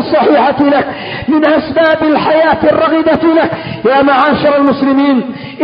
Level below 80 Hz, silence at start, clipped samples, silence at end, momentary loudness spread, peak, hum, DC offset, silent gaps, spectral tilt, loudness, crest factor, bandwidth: -44 dBFS; 0 s; under 0.1%; 0 s; 6 LU; 0 dBFS; none; under 0.1%; none; -8.5 dB/octave; -10 LUFS; 10 dB; 5.4 kHz